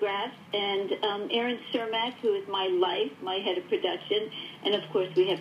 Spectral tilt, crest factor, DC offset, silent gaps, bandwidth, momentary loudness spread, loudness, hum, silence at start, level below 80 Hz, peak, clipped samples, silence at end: -5.5 dB/octave; 16 dB; under 0.1%; none; 10.5 kHz; 5 LU; -29 LUFS; none; 0 s; -84 dBFS; -14 dBFS; under 0.1%; 0 s